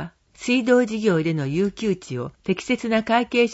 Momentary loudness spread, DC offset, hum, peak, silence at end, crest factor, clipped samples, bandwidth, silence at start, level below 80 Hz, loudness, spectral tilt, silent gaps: 11 LU; under 0.1%; none; -4 dBFS; 0 s; 18 dB; under 0.1%; 8 kHz; 0 s; -56 dBFS; -22 LUFS; -6 dB/octave; none